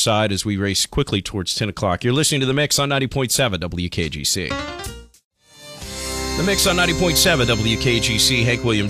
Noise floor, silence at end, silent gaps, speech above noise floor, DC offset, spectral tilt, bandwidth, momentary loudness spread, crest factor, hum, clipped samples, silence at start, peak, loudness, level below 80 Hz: -41 dBFS; 0 s; 5.24-5.31 s; 22 dB; under 0.1%; -3.5 dB/octave; 16 kHz; 11 LU; 16 dB; none; under 0.1%; 0 s; -4 dBFS; -18 LUFS; -36 dBFS